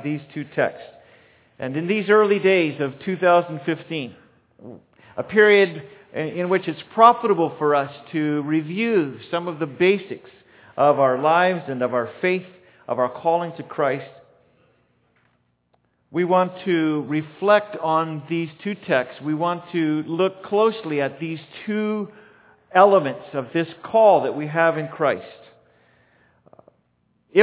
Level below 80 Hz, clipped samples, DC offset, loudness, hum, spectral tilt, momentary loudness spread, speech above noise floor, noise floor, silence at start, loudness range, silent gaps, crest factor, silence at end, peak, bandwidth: -70 dBFS; under 0.1%; under 0.1%; -21 LUFS; none; -10 dB/octave; 14 LU; 46 dB; -66 dBFS; 0 s; 6 LU; none; 20 dB; 0 s; 0 dBFS; 4 kHz